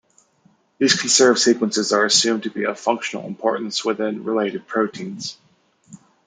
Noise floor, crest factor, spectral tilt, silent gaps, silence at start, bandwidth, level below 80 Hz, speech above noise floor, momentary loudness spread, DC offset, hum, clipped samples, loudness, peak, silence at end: -59 dBFS; 20 dB; -2 dB/octave; none; 0.8 s; 10 kHz; -70 dBFS; 39 dB; 12 LU; under 0.1%; none; under 0.1%; -19 LUFS; -2 dBFS; 0.3 s